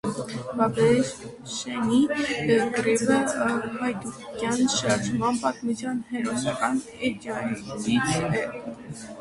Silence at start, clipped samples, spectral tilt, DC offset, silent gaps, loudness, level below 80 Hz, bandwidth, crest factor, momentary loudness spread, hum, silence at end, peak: 0.05 s; under 0.1%; -4.5 dB/octave; under 0.1%; none; -25 LUFS; -56 dBFS; 11.5 kHz; 18 dB; 11 LU; none; 0 s; -8 dBFS